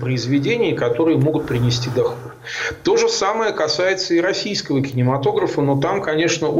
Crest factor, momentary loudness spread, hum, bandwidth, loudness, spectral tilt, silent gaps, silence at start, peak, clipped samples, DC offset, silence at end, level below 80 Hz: 10 dB; 5 LU; none; 16 kHz; -19 LUFS; -5 dB/octave; none; 0 s; -8 dBFS; under 0.1%; under 0.1%; 0 s; -50 dBFS